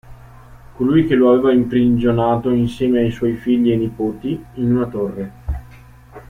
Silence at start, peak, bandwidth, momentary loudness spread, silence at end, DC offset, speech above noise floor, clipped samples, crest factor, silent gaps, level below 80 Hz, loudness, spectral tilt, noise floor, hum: 0.05 s; -2 dBFS; 9.2 kHz; 12 LU; 0.1 s; under 0.1%; 26 dB; under 0.1%; 14 dB; none; -38 dBFS; -17 LUFS; -9 dB/octave; -42 dBFS; 60 Hz at -30 dBFS